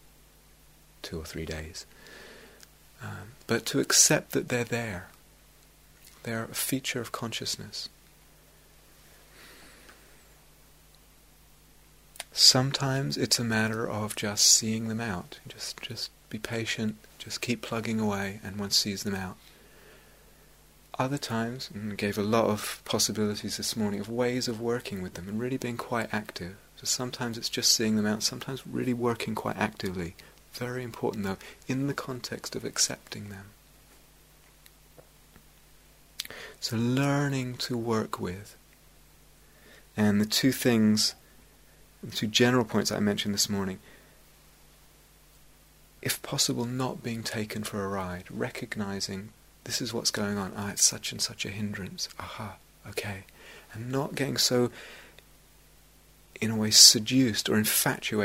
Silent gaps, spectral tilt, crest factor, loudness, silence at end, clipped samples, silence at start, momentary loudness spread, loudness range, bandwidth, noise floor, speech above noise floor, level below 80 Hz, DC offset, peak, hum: none; -3 dB/octave; 30 dB; -27 LUFS; 0 s; under 0.1%; 1.05 s; 18 LU; 9 LU; 16 kHz; -57 dBFS; 29 dB; -60 dBFS; under 0.1%; 0 dBFS; none